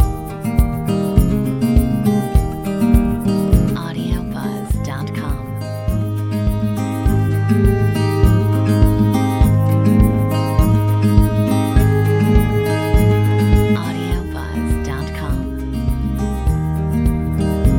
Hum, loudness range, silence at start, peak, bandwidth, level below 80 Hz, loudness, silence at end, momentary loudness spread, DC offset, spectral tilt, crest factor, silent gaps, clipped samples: none; 6 LU; 0 s; 0 dBFS; 17 kHz; -22 dBFS; -17 LUFS; 0 s; 9 LU; under 0.1%; -7.5 dB/octave; 14 dB; none; under 0.1%